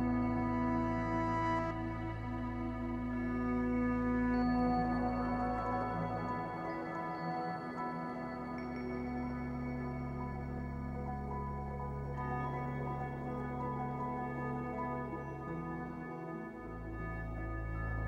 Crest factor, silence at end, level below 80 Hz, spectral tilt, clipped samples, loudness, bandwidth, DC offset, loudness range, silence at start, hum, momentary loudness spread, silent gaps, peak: 16 dB; 0 s; -48 dBFS; -9 dB/octave; under 0.1%; -38 LUFS; 7.4 kHz; under 0.1%; 6 LU; 0 s; none; 8 LU; none; -22 dBFS